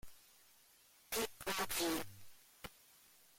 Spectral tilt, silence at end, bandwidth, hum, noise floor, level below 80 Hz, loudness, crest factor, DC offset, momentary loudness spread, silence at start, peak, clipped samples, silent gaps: -2 dB/octave; 0.65 s; 16.5 kHz; none; -68 dBFS; -66 dBFS; -40 LUFS; 18 dB; under 0.1%; 26 LU; 0.05 s; -28 dBFS; under 0.1%; none